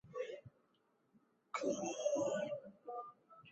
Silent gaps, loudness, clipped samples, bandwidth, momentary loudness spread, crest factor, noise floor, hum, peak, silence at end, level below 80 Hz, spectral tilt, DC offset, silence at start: none; -42 LUFS; under 0.1%; 8.2 kHz; 16 LU; 18 dB; -78 dBFS; none; -26 dBFS; 0 s; -82 dBFS; -4 dB/octave; under 0.1%; 0.05 s